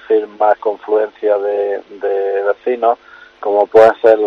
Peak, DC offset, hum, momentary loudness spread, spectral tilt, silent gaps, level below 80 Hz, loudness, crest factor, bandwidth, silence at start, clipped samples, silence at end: 0 dBFS; under 0.1%; none; 11 LU; -6 dB/octave; none; -58 dBFS; -15 LUFS; 14 dB; 6.6 kHz; 0.1 s; 0.3%; 0 s